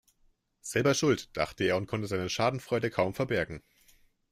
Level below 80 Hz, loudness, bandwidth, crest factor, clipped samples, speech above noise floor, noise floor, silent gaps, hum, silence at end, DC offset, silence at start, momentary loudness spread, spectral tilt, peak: -60 dBFS; -30 LUFS; 16 kHz; 18 dB; under 0.1%; 39 dB; -69 dBFS; none; none; 0.75 s; under 0.1%; 0.65 s; 7 LU; -5 dB/octave; -12 dBFS